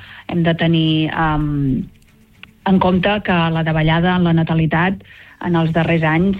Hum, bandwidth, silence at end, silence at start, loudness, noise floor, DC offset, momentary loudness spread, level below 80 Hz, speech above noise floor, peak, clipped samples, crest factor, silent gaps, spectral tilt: none; 4.8 kHz; 0 s; 0 s; -16 LUFS; -45 dBFS; under 0.1%; 8 LU; -36 dBFS; 29 dB; -2 dBFS; under 0.1%; 14 dB; none; -9 dB/octave